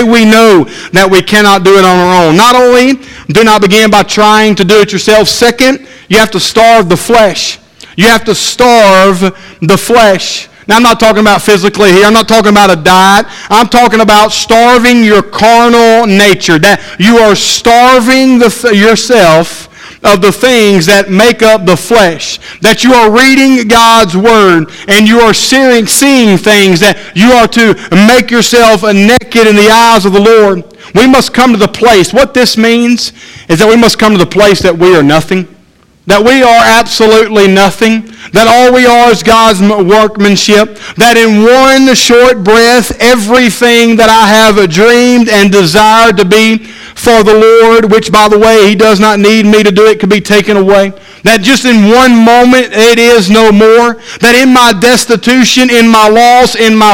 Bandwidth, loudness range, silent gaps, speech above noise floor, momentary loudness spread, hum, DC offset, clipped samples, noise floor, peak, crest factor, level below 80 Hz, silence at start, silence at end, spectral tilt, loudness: 18 kHz; 2 LU; none; 39 dB; 6 LU; none; under 0.1%; 9%; -43 dBFS; 0 dBFS; 4 dB; -34 dBFS; 0 s; 0 s; -4 dB/octave; -4 LUFS